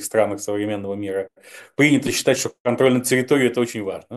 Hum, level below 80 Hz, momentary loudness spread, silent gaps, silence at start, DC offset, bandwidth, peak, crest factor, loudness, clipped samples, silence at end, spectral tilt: none; -64 dBFS; 11 LU; 2.60-2.65 s; 0 s; under 0.1%; 13 kHz; -4 dBFS; 18 dB; -20 LUFS; under 0.1%; 0 s; -4.5 dB/octave